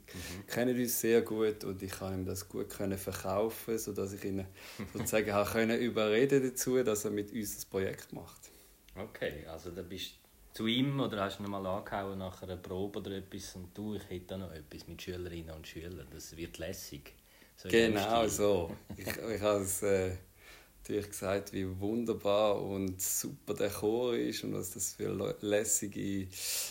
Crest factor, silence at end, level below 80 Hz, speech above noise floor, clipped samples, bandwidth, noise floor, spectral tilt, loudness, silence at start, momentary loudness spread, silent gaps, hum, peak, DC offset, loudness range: 22 dB; 0 s; -60 dBFS; 23 dB; under 0.1%; 16 kHz; -57 dBFS; -4 dB/octave; -34 LUFS; 0.1 s; 16 LU; none; none; -14 dBFS; under 0.1%; 10 LU